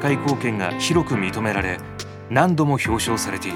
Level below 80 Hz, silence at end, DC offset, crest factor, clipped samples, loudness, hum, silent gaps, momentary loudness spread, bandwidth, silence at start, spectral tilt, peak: -44 dBFS; 0 s; under 0.1%; 20 dB; under 0.1%; -21 LUFS; none; none; 8 LU; 17.5 kHz; 0 s; -5 dB/octave; 0 dBFS